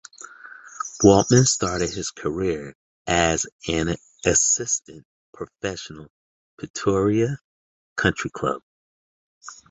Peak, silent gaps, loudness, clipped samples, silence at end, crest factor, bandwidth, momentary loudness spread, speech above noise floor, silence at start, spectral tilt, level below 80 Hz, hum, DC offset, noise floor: -2 dBFS; 2.75-3.05 s, 3.52-3.59 s, 5.05-5.33 s, 6.10-6.58 s, 6.70-6.74 s, 7.44-7.96 s, 8.63-9.41 s; -21 LUFS; under 0.1%; 0.15 s; 22 dB; 8.4 kHz; 23 LU; 22 dB; 0.2 s; -4 dB/octave; -46 dBFS; none; under 0.1%; -44 dBFS